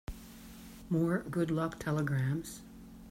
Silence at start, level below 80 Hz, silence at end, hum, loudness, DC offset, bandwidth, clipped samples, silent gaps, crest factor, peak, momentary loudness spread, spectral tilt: 0.1 s; -54 dBFS; 0 s; none; -34 LUFS; under 0.1%; 16 kHz; under 0.1%; none; 16 dB; -20 dBFS; 19 LU; -7 dB/octave